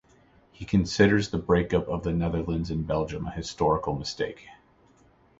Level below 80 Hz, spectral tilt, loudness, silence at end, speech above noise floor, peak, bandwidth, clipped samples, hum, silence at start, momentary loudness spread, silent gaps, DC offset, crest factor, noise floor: -42 dBFS; -6.5 dB/octave; -27 LUFS; 0.85 s; 34 dB; -6 dBFS; 8 kHz; under 0.1%; none; 0.6 s; 12 LU; none; under 0.1%; 22 dB; -60 dBFS